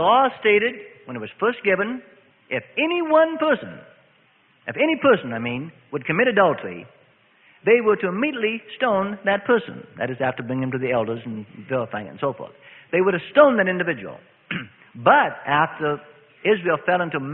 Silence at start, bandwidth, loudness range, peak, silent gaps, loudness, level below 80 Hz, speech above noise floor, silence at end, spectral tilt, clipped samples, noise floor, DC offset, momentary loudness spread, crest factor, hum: 0 s; 4.1 kHz; 4 LU; 0 dBFS; none; -21 LUFS; -64 dBFS; 38 dB; 0 s; -10.5 dB/octave; under 0.1%; -59 dBFS; under 0.1%; 16 LU; 22 dB; none